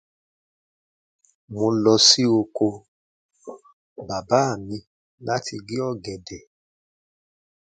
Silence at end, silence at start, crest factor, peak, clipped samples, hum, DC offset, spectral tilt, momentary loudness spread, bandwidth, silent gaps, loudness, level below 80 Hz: 1.4 s; 1.5 s; 24 dB; -2 dBFS; under 0.1%; none; under 0.1%; -3.5 dB/octave; 28 LU; 9.4 kHz; 2.88-3.29 s, 3.73-3.96 s, 4.87-5.18 s; -20 LUFS; -60 dBFS